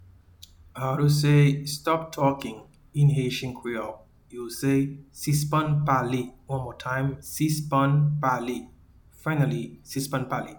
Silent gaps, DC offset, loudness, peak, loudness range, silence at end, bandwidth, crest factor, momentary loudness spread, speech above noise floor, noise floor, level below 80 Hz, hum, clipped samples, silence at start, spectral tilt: none; under 0.1%; -26 LUFS; -8 dBFS; 3 LU; 0 s; 19 kHz; 16 dB; 12 LU; 28 dB; -53 dBFS; -54 dBFS; none; under 0.1%; 0.75 s; -6 dB/octave